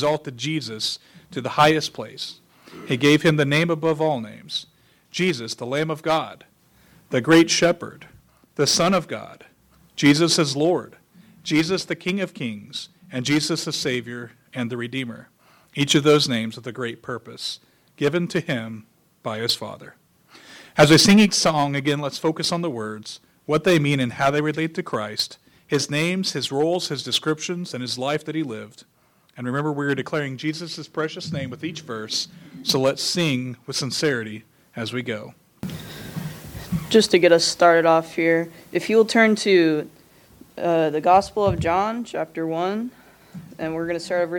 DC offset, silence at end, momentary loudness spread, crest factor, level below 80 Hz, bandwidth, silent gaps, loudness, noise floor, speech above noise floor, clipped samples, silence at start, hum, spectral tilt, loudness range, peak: under 0.1%; 0 s; 17 LU; 20 dB; -56 dBFS; 19 kHz; none; -21 LUFS; -55 dBFS; 34 dB; under 0.1%; 0 s; none; -4.5 dB/octave; 8 LU; -2 dBFS